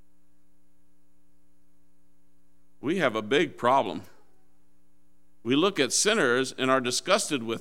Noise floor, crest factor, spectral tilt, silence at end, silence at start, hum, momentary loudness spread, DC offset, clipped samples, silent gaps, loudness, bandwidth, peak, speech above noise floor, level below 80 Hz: -69 dBFS; 22 dB; -3 dB/octave; 0 s; 2.85 s; none; 10 LU; 0.5%; under 0.1%; none; -25 LUFS; 16 kHz; -8 dBFS; 43 dB; -72 dBFS